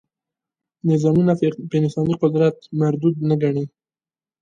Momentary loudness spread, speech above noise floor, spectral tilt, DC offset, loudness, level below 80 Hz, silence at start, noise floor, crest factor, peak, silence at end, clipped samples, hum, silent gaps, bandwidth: 5 LU; over 72 dB; -9 dB/octave; under 0.1%; -20 LUFS; -58 dBFS; 0.85 s; under -90 dBFS; 16 dB; -4 dBFS; 0.75 s; under 0.1%; none; none; 7.6 kHz